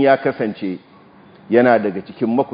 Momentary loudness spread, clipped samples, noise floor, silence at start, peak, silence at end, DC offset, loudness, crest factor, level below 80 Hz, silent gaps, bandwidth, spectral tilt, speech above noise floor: 14 LU; under 0.1%; -46 dBFS; 0 s; 0 dBFS; 0.05 s; under 0.1%; -18 LUFS; 18 dB; -62 dBFS; none; 5.2 kHz; -10 dB/octave; 29 dB